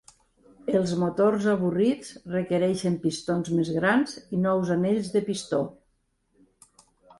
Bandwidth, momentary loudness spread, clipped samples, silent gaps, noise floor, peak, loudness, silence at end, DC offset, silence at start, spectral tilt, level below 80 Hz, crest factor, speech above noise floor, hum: 11.5 kHz; 7 LU; under 0.1%; none; -71 dBFS; -10 dBFS; -26 LUFS; 1.45 s; under 0.1%; 0.65 s; -6.5 dB/octave; -62 dBFS; 16 dB; 46 dB; none